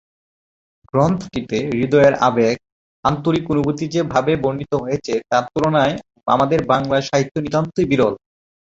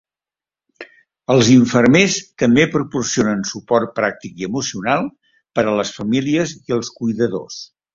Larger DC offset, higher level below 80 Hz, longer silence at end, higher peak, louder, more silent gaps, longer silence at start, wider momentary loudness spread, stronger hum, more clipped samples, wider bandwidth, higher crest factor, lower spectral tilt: neither; about the same, -48 dBFS vs -52 dBFS; first, 0.5 s vs 0.3 s; about the same, -2 dBFS vs 0 dBFS; about the same, -18 LUFS vs -17 LUFS; first, 2.72-3.03 s, 7.31-7.35 s vs none; first, 0.95 s vs 0.8 s; second, 7 LU vs 13 LU; neither; neither; about the same, 8 kHz vs 7.6 kHz; about the same, 18 dB vs 18 dB; first, -6.5 dB/octave vs -5 dB/octave